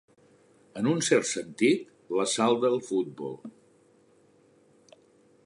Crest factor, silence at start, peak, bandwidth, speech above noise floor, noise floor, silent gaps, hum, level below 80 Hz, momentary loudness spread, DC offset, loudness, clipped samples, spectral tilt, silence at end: 20 dB; 0.75 s; -10 dBFS; 11.5 kHz; 35 dB; -62 dBFS; none; none; -78 dBFS; 15 LU; under 0.1%; -27 LUFS; under 0.1%; -4 dB/octave; 1.95 s